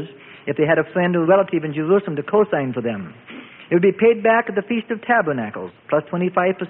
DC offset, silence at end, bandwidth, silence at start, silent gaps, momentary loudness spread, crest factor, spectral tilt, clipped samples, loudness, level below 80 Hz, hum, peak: under 0.1%; 0 s; 3.9 kHz; 0 s; none; 16 LU; 16 dB; -12 dB/octave; under 0.1%; -19 LUFS; -64 dBFS; none; -4 dBFS